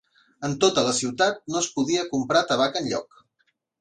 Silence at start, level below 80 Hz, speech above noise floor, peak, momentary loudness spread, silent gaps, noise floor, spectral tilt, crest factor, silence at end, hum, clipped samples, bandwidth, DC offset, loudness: 0.4 s; -64 dBFS; 48 dB; -6 dBFS; 9 LU; none; -71 dBFS; -3 dB/octave; 20 dB; 0.75 s; none; under 0.1%; 11 kHz; under 0.1%; -23 LUFS